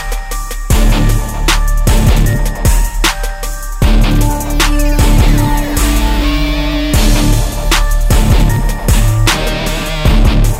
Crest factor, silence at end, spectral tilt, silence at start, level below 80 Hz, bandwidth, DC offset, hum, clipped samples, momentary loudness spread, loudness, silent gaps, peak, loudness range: 10 dB; 0 s; -4.5 dB/octave; 0 s; -12 dBFS; 16.5 kHz; under 0.1%; none; under 0.1%; 5 LU; -13 LUFS; none; 0 dBFS; 1 LU